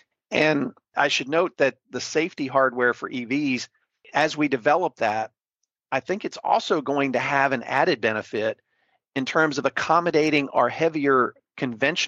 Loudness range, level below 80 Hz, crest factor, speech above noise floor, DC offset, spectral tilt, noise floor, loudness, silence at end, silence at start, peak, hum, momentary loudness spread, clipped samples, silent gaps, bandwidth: 2 LU; -68 dBFS; 18 dB; 59 dB; under 0.1%; -4.5 dB/octave; -82 dBFS; -23 LUFS; 0 s; 0.3 s; -6 dBFS; none; 9 LU; under 0.1%; none; 8.2 kHz